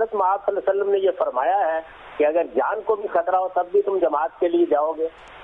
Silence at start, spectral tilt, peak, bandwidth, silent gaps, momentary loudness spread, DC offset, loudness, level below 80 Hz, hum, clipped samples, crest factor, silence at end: 0 s; -7 dB/octave; -10 dBFS; 3.9 kHz; none; 4 LU; under 0.1%; -22 LUFS; -60 dBFS; none; under 0.1%; 12 dB; 0 s